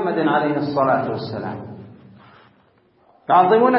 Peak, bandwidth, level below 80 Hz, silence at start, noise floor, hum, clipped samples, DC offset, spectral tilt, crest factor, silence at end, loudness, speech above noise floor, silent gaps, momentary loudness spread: -2 dBFS; 5.8 kHz; -64 dBFS; 0 s; -57 dBFS; none; under 0.1%; under 0.1%; -11.5 dB/octave; 18 dB; 0 s; -19 LUFS; 40 dB; none; 22 LU